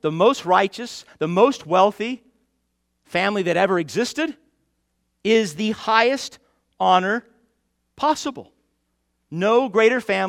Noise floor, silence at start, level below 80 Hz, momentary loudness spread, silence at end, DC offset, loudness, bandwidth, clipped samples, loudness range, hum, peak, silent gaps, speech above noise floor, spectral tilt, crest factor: -72 dBFS; 0.05 s; -66 dBFS; 11 LU; 0 s; under 0.1%; -20 LUFS; 15 kHz; under 0.1%; 3 LU; none; 0 dBFS; none; 52 dB; -4.5 dB/octave; 20 dB